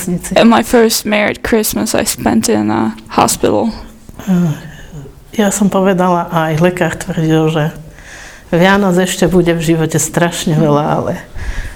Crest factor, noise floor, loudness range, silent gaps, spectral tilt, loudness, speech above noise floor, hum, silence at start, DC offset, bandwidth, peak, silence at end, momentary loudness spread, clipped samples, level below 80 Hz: 12 dB; -33 dBFS; 3 LU; none; -5 dB/octave; -12 LUFS; 21 dB; none; 0 s; under 0.1%; 19.5 kHz; 0 dBFS; 0 s; 16 LU; 0.1%; -34 dBFS